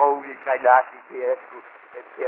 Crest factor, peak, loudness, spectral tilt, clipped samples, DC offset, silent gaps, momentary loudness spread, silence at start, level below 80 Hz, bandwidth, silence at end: 20 dB; -2 dBFS; -21 LUFS; -1 dB/octave; under 0.1%; under 0.1%; none; 25 LU; 0 s; -86 dBFS; 3.5 kHz; 0 s